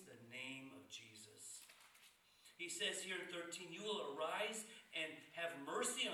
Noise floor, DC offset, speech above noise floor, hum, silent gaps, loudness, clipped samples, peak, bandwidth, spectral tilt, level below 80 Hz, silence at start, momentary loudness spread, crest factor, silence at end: -70 dBFS; under 0.1%; 23 dB; none; none; -47 LUFS; under 0.1%; -30 dBFS; 19.5 kHz; -1.5 dB/octave; under -90 dBFS; 0 s; 20 LU; 18 dB; 0 s